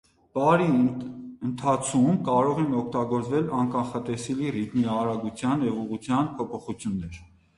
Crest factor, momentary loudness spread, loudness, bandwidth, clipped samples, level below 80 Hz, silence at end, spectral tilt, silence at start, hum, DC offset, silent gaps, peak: 18 dB; 11 LU; -26 LUFS; 11.5 kHz; under 0.1%; -56 dBFS; 0.35 s; -6.5 dB/octave; 0.35 s; none; under 0.1%; none; -6 dBFS